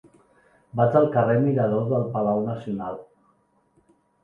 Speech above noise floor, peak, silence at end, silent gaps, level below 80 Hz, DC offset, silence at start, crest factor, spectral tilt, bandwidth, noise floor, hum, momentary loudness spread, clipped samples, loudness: 43 dB; -6 dBFS; 1.2 s; none; -62 dBFS; under 0.1%; 0.75 s; 18 dB; -11 dB/octave; 4 kHz; -65 dBFS; none; 13 LU; under 0.1%; -23 LUFS